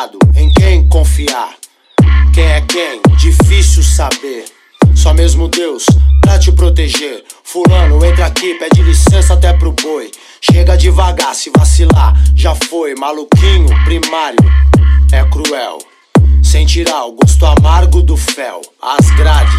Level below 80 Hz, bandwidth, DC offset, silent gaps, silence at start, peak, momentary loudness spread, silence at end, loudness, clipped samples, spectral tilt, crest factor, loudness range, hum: -10 dBFS; 13 kHz; under 0.1%; none; 0 s; 0 dBFS; 9 LU; 0 s; -9 LUFS; under 0.1%; -5.5 dB/octave; 8 dB; 1 LU; none